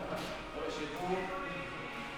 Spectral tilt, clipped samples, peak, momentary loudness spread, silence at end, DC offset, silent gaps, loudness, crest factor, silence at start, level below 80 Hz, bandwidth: -4.5 dB/octave; under 0.1%; -22 dBFS; 5 LU; 0 s; under 0.1%; none; -39 LUFS; 16 dB; 0 s; -56 dBFS; over 20 kHz